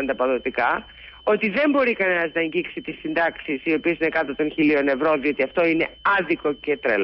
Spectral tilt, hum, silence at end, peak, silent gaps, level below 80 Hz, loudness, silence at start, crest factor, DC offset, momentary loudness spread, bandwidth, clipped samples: -10 dB/octave; none; 0 s; -10 dBFS; none; -54 dBFS; -22 LUFS; 0 s; 12 dB; under 0.1%; 7 LU; 5.8 kHz; under 0.1%